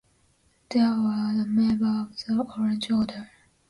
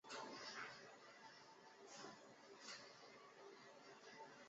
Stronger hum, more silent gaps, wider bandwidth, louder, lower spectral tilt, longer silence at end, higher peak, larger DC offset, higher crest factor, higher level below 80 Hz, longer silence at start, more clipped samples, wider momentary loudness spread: neither; neither; first, 11 kHz vs 7.6 kHz; first, -25 LUFS vs -58 LUFS; first, -6.5 dB/octave vs -0.5 dB/octave; first, 0.45 s vs 0 s; first, -12 dBFS vs -40 dBFS; neither; second, 14 dB vs 20 dB; first, -60 dBFS vs under -90 dBFS; first, 0.7 s vs 0.05 s; neither; second, 6 LU vs 10 LU